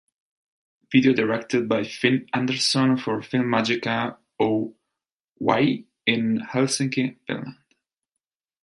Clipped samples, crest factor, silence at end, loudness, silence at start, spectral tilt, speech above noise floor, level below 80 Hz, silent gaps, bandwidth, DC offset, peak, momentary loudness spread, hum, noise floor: under 0.1%; 22 dB; 1.1 s; -23 LUFS; 0.9 s; -4.5 dB/octave; 64 dB; -66 dBFS; 5.12-5.36 s; 11.5 kHz; under 0.1%; -4 dBFS; 8 LU; none; -86 dBFS